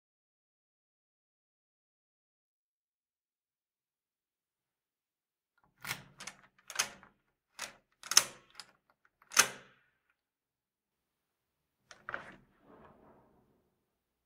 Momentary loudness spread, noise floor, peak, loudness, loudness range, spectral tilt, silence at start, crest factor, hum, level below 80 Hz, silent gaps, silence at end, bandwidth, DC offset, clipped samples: 26 LU; under -90 dBFS; -4 dBFS; -32 LUFS; 20 LU; 1.5 dB/octave; 5.85 s; 38 dB; none; -80 dBFS; none; 1.9 s; 16 kHz; under 0.1%; under 0.1%